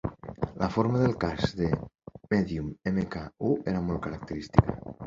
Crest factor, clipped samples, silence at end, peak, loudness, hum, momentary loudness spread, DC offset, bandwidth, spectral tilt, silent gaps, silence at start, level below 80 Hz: 26 dB; under 0.1%; 0 s; -2 dBFS; -29 LUFS; none; 11 LU; under 0.1%; 7.6 kHz; -8 dB/octave; none; 0.05 s; -44 dBFS